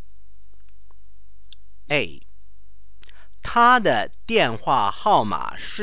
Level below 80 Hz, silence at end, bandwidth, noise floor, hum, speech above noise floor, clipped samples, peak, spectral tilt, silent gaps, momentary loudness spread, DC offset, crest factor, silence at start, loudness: -50 dBFS; 0 s; 4 kHz; -53 dBFS; none; 33 dB; under 0.1%; -4 dBFS; -8.5 dB/octave; none; 14 LU; 4%; 20 dB; 1.9 s; -20 LUFS